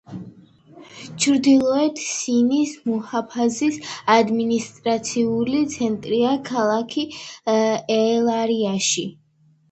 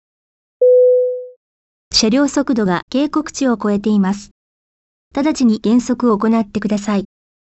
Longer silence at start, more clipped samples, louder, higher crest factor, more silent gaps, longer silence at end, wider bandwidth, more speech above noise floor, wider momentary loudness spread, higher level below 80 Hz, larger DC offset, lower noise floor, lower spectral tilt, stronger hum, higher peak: second, 0.1 s vs 0.6 s; neither; second, -20 LUFS vs -15 LUFS; first, 20 dB vs 14 dB; second, none vs 1.36-1.91 s, 2.82-2.88 s, 4.31-5.11 s; about the same, 0.6 s vs 0.55 s; about the same, 8.8 kHz vs 8.4 kHz; second, 28 dB vs over 75 dB; about the same, 9 LU vs 9 LU; second, -62 dBFS vs -48 dBFS; neither; second, -48 dBFS vs under -90 dBFS; about the same, -4 dB/octave vs -5 dB/octave; neither; about the same, -2 dBFS vs -2 dBFS